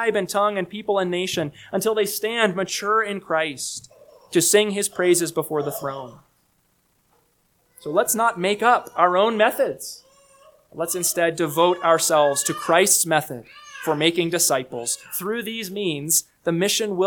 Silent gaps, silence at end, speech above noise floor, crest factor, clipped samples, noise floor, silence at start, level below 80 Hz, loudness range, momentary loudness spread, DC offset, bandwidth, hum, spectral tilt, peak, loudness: none; 0 s; 44 dB; 20 dB; under 0.1%; -65 dBFS; 0 s; -66 dBFS; 5 LU; 12 LU; under 0.1%; 19 kHz; none; -2.5 dB/octave; -2 dBFS; -21 LUFS